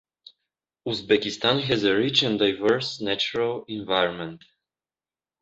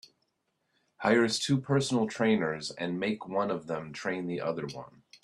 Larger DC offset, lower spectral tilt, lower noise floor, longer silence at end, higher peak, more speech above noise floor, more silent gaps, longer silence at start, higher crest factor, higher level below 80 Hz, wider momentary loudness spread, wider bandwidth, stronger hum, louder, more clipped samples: neither; about the same, -4.5 dB/octave vs -5 dB/octave; first, under -90 dBFS vs -78 dBFS; first, 1.05 s vs 0.05 s; first, -6 dBFS vs -12 dBFS; first, over 66 dB vs 49 dB; neither; second, 0.85 s vs 1 s; about the same, 20 dB vs 20 dB; first, -62 dBFS vs -70 dBFS; about the same, 11 LU vs 9 LU; second, 8 kHz vs 12.5 kHz; neither; first, -23 LUFS vs -30 LUFS; neither